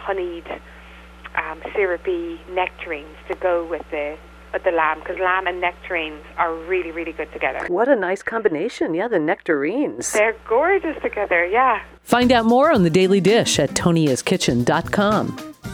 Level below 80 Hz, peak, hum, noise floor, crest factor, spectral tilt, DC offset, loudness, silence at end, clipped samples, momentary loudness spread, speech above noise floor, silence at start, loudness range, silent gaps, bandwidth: -46 dBFS; -2 dBFS; none; -40 dBFS; 18 dB; -4.5 dB/octave; under 0.1%; -20 LUFS; 0 s; under 0.1%; 13 LU; 21 dB; 0 s; 8 LU; none; 17.5 kHz